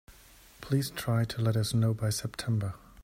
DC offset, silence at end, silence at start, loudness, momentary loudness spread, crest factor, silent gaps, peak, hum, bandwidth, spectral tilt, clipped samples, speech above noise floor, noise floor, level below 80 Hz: under 0.1%; 0 s; 0.1 s; -31 LUFS; 5 LU; 16 dB; none; -16 dBFS; none; 16 kHz; -5.5 dB/octave; under 0.1%; 27 dB; -56 dBFS; -56 dBFS